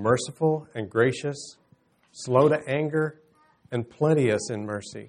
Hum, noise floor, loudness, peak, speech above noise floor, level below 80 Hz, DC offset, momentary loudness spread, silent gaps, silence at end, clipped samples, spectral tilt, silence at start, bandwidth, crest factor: none; -62 dBFS; -25 LUFS; -6 dBFS; 38 dB; -66 dBFS; under 0.1%; 12 LU; none; 0 s; under 0.1%; -6 dB/octave; 0 s; 10.5 kHz; 20 dB